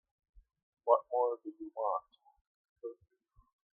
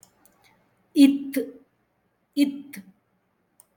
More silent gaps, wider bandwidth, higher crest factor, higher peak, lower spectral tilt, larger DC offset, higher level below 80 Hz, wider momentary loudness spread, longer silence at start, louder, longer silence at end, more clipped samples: first, 2.41-2.76 s vs none; second, 3.6 kHz vs 17.5 kHz; about the same, 26 dB vs 22 dB; second, -12 dBFS vs -4 dBFS; first, -8.5 dB/octave vs -4 dB/octave; neither; about the same, -74 dBFS vs -76 dBFS; second, 18 LU vs 22 LU; about the same, 0.85 s vs 0.95 s; second, -34 LUFS vs -23 LUFS; about the same, 0.85 s vs 0.95 s; neither